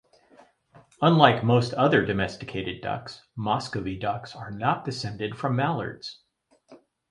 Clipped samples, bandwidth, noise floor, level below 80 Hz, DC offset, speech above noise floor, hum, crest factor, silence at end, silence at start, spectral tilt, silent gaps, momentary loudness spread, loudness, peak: under 0.1%; 11 kHz; -66 dBFS; -56 dBFS; under 0.1%; 41 dB; none; 26 dB; 0.35 s; 1 s; -6.5 dB/octave; none; 16 LU; -25 LUFS; 0 dBFS